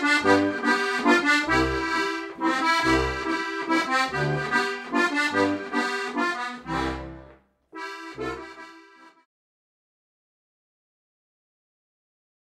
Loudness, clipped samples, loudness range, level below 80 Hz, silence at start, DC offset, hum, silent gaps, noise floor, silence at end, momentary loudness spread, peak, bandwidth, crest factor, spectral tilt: -24 LUFS; under 0.1%; 17 LU; -46 dBFS; 0 s; under 0.1%; none; none; -53 dBFS; 3.45 s; 15 LU; -6 dBFS; 14.5 kHz; 20 dB; -4.5 dB/octave